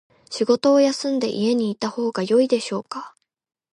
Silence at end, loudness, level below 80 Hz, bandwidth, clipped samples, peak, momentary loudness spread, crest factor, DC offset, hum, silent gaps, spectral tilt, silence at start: 0.65 s; -21 LUFS; -72 dBFS; 11.5 kHz; under 0.1%; -6 dBFS; 13 LU; 16 dB; under 0.1%; none; none; -5 dB/octave; 0.3 s